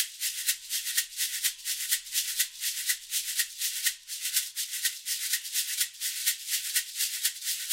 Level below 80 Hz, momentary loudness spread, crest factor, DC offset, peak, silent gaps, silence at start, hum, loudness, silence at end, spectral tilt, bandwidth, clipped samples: -74 dBFS; 2 LU; 22 dB; under 0.1%; -8 dBFS; none; 0 s; none; -28 LUFS; 0 s; 7 dB/octave; 16 kHz; under 0.1%